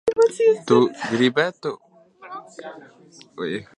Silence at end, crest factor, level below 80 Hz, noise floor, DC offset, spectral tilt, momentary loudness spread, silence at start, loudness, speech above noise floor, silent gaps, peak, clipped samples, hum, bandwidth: 0.15 s; 20 dB; -66 dBFS; -41 dBFS; under 0.1%; -5.5 dB/octave; 21 LU; 0.05 s; -20 LUFS; 20 dB; none; -2 dBFS; under 0.1%; none; 10.5 kHz